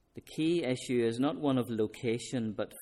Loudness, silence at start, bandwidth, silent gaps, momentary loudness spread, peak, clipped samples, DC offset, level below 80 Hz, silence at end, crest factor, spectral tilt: -32 LUFS; 0.15 s; 15 kHz; none; 6 LU; -18 dBFS; under 0.1%; under 0.1%; -68 dBFS; 0 s; 14 dB; -6 dB/octave